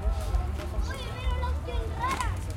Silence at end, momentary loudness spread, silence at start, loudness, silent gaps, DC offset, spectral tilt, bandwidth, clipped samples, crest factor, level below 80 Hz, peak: 0 s; 4 LU; 0 s; -32 LUFS; none; under 0.1%; -5.5 dB/octave; 15.5 kHz; under 0.1%; 14 dB; -32 dBFS; -16 dBFS